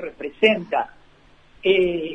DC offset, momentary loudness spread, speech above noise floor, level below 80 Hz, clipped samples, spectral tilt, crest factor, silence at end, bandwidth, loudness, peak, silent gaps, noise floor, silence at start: under 0.1%; 12 LU; 32 dB; -54 dBFS; under 0.1%; -6 dB/octave; 18 dB; 0 s; 8 kHz; -20 LUFS; -4 dBFS; none; -52 dBFS; 0 s